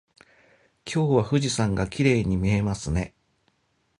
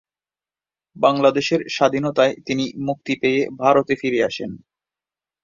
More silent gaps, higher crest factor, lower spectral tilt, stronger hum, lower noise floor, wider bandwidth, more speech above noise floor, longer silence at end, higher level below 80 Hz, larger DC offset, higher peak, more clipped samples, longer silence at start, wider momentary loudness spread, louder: neither; about the same, 20 dB vs 20 dB; about the same, -6 dB/octave vs -5 dB/octave; neither; second, -70 dBFS vs under -90 dBFS; first, 11.5 kHz vs 7.6 kHz; second, 47 dB vs over 71 dB; about the same, 0.9 s vs 0.85 s; first, -42 dBFS vs -62 dBFS; neither; second, -6 dBFS vs -2 dBFS; neither; about the same, 0.85 s vs 0.95 s; about the same, 8 LU vs 7 LU; second, -24 LUFS vs -19 LUFS